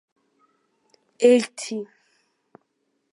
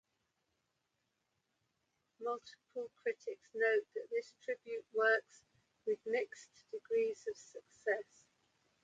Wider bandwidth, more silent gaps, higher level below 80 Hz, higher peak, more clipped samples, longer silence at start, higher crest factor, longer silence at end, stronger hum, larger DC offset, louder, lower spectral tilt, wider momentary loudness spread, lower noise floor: first, 11.5 kHz vs 7.8 kHz; neither; first, -82 dBFS vs under -90 dBFS; first, -4 dBFS vs -20 dBFS; neither; second, 1.2 s vs 2.2 s; about the same, 22 dB vs 22 dB; first, 1.3 s vs 0.8 s; neither; neither; first, -21 LUFS vs -39 LUFS; about the same, -3.5 dB/octave vs -2.5 dB/octave; about the same, 17 LU vs 16 LU; second, -74 dBFS vs -85 dBFS